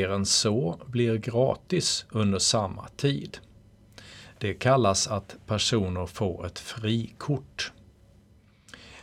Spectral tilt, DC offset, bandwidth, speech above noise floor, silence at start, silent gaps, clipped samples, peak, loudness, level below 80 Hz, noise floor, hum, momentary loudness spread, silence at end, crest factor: -4 dB/octave; under 0.1%; 15.5 kHz; 31 dB; 0 s; none; under 0.1%; -8 dBFS; -27 LUFS; -54 dBFS; -58 dBFS; none; 13 LU; 0 s; 20 dB